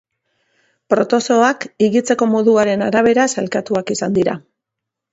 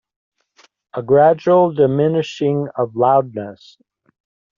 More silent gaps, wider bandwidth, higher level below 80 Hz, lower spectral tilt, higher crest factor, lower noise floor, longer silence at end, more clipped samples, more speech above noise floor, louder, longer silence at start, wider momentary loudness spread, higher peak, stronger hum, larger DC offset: neither; about the same, 8 kHz vs 7.4 kHz; about the same, -58 dBFS vs -62 dBFS; second, -5 dB/octave vs -6.5 dB/octave; about the same, 16 dB vs 16 dB; first, -81 dBFS vs -55 dBFS; second, 0.75 s vs 1.05 s; neither; first, 66 dB vs 39 dB; about the same, -16 LUFS vs -15 LUFS; about the same, 0.9 s vs 0.95 s; second, 7 LU vs 17 LU; about the same, 0 dBFS vs -2 dBFS; neither; neither